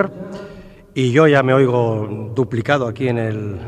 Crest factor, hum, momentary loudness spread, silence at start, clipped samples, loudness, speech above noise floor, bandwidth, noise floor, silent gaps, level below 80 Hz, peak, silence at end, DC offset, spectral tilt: 18 dB; none; 19 LU; 0 s; under 0.1%; -17 LUFS; 23 dB; 9.8 kHz; -39 dBFS; none; -50 dBFS; 0 dBFS; 0 s; under 0.1%; -7.5 dB/octave